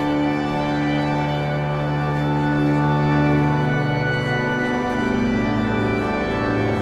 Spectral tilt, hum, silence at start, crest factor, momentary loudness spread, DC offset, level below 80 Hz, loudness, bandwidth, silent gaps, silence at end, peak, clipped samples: -7.5 dB/octave; none; 0 s; 12 dB; 4 LU; under 0.1%; -40 dBFS; -20 LUFS; 9.2 kHz; none; 0 s; -8 dBFS; under 0.1%